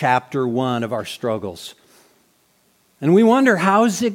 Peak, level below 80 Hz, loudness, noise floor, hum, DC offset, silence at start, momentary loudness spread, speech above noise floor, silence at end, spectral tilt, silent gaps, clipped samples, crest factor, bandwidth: -2 dBFS; -66 dBFS; -18 LUFS; -60 dBFS; none; under 0.1%; 0 s; 14 LU; 43 dB; 0 s; -5.5 dB/octave; none; under 0.1%; 18 dB; 16.5 kHz